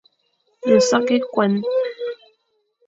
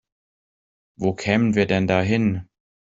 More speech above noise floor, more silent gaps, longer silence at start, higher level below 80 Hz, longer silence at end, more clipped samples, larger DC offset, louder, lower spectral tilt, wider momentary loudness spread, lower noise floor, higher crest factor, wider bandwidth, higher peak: second, 51 dB vs over 70 dB; neither; second, 0.65 s vs 1 s; second, -66 dBFS vs -54 dBFS; first, 0.75 s vs 0.55 s; neither; neither; about the same, -19 LUFS vs -21 LUFS; second, -5 dB/octave vs -7 dB/octave; first, 15 LU vs 7 LU; second, -68 dBFS vs under -90 dBFS; about the same, 18 dB vs 20 dB; about the same, 7.8 kHz vs 7.8 kHz; about the same, -4 dBFS vs -4 dBFS